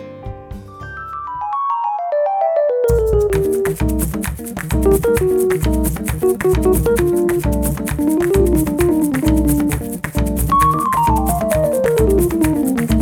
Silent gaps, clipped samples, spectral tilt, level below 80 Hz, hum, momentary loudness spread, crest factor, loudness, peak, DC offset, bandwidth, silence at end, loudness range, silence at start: none; under 0.1%; -6.5 dB/octave; -24 dBFS; none; 10 LU; 16 dB; -16 LUFS; 0 dBFS; under 0.1%; 20 kHz; 0 s; 2 LU; 0 s